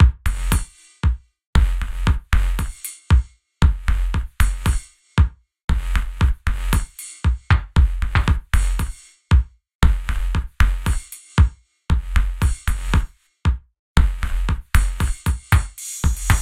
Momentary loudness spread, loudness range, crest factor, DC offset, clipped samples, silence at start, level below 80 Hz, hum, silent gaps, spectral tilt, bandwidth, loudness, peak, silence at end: 8 LU; 2 LU; 18 dB; under 0.1%; under 0.1%; 0 s; -20 dBFS; none; 1.46-1.53 s, 5.64-5.68 s, 9.75-9.79 s, 13.79-13.95 s; -5 dB/octave; 15 kHz; -22 LUFS; 0 dBFS; 0 s